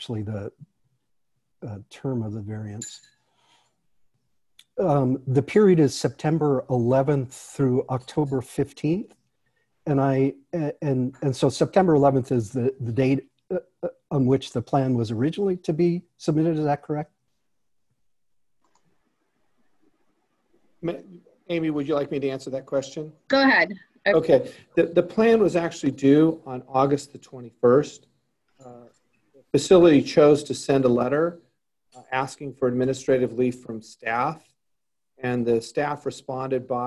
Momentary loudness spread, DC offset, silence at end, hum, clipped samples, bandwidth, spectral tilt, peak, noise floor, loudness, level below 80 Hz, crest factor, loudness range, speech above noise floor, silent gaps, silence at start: 16 LU; under 0.1%; 0 s; none; under 0.1%; 12 kHz; -6.5 dB/octave; -4 dBFS; -83 dBFS; -23 LUFS; -58 dBFS; 20 dB; 13 LU; 61 dB; none; 0 s